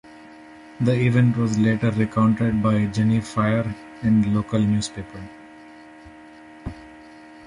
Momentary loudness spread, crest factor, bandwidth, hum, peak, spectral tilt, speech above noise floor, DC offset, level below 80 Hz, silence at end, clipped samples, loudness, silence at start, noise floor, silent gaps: 18 LU; 16 dB; 11 kHz; none; -6 dBFS; -7.5 dB/octave; 24 dB; under 0.1%; -48 dBFS; 0 s; under 0.1%; -21 LUFS; 0.15 s; -44 dBFS; none